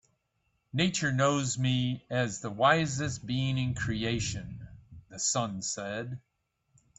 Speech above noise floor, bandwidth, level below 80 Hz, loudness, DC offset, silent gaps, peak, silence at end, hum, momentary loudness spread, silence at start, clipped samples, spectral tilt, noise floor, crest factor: 47 dB; 8.4 kHz; -56 dBFS; -30 LUFS; under 0.1%; none; -10 dBFS; 0.8 s; none; 14 LU; 0.75 s; under 0.1%; -4 dB/octave; -77 dBFS; 20 dB